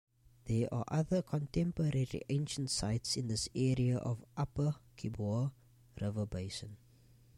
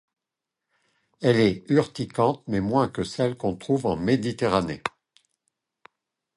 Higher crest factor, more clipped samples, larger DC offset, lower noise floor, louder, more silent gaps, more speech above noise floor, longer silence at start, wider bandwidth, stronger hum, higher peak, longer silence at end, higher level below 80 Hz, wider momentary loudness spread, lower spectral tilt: about the same, 16 dB vs 20 dB; neither; neither; second, -63 dBFS vs -86 dBFS; second, -36 LUFS vs -25 LUFS; neither; second, 28 dB vs 63 dB; second, 0.45 s vs 1.2 s; first, 13 kHz vs 11.5 kHz; neither; second, -22 dBFS vs -6 dBFS; second, 0.6 s vs 1.5 s; about the same, -56 dBFS vs -54 dBFS; about the same, 8 LU vs 9 LU; about the same, -6 dB/octave vs -6.5 dB/octave